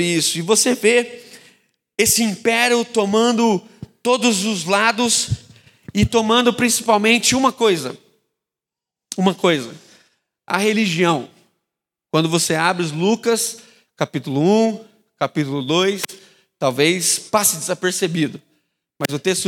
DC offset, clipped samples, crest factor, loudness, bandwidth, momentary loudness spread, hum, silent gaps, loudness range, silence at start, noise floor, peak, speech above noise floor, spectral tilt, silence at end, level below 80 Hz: under 0.1%; under 0.1%; 18 dB; -18 LUFS; 18 kHz; 10 LU; none; none; 4 LU; 0 s; -87 dBFS; 0 dBFS; 70 dB; -3.5 dB/octave; 0 s; -50 dBFS